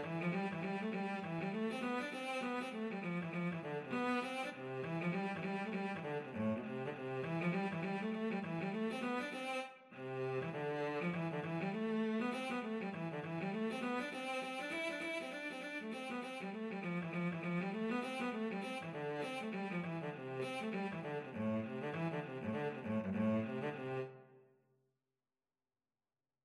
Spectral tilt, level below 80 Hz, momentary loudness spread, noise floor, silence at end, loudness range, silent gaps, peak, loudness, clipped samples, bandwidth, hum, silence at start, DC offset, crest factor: -6.5 dB/octave; -86 dBFS; 5 LU; under -90 dBFS; 2.05 s; 2 LU; none; -26 dBFS; -41 LUFS; under 0.1%; 12.5 kHz; none; 0 s; under 0.1%; 14 dB